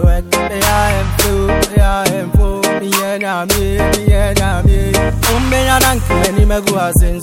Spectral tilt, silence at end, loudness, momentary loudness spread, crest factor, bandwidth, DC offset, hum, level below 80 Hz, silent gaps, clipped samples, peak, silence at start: -4.5 dB/octave; 0 s; -13 LUFS; 3 LU; 12 dB; 17 kHz; under 0.1%; none; -16 dBFS; none; under 0.1%; 0 dBFS; 0 s